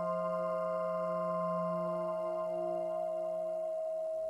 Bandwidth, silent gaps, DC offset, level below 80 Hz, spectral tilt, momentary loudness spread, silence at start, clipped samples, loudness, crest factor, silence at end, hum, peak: 12 kHz; none; under 0.1%; -84 dBFS; -8 dB/octave; 2 LU; 0 s; under 0.1%; -36 LUFS; 10 dB; 0 s; none; -26 dBFS